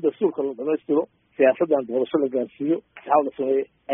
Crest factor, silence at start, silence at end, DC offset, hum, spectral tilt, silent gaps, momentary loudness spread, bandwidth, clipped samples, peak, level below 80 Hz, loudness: 18 dB; 0 s; 0 s; under 0.1%; none; -2 dB/octave; none; 6 LU; 3.8 kHz; under 0.1%; -6 dBFS; -70 dBFS; -23 LUFS